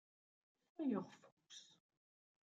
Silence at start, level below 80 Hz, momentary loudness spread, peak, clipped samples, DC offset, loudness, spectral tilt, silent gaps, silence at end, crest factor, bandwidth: 0.8 s; under -90 dBFS; 23 LU; -28 dBFS; under 0.1%; under 0.1%; -45 LUFS; -6 dB/octave; 1.32-1.37 s; 0.9 s; 22 dB; 7.8 kHz